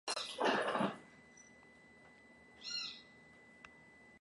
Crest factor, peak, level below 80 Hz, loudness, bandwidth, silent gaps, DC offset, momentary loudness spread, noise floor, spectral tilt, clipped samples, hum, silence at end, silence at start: 22 dB; -22 dBFS; -80 dBFS; -38 LUFS; 11.5 kHz; none; under 0.1%; 25 LU; -62 dBFS; -3 dB/octave; under 0.1%; none; 0.05 s; 0.05 s